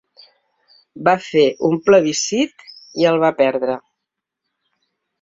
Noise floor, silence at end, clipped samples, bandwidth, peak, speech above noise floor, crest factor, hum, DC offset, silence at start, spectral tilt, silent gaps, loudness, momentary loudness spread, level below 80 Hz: -81 dBFS; 1.45 s; under 0.1%; 7.8 kHz; -2 dBFS; 65 dB; 18 dB; none; under 0.1%; 0.95 s; -4 dB/octave; none; -17 LUFS; 10 LU; -62 dBFS